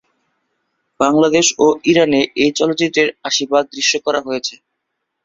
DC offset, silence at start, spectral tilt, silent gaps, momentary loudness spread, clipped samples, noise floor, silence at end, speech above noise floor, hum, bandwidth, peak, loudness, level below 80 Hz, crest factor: under 0.1%; 1 s; -3 dB/octave; none; 7 LU; under 0.1%; -75 dBFS; 0.7 s; 60 dB; none; 7.8 kHz; 0 dBFS; -15 LUFS; -56 dBFS; 16 dB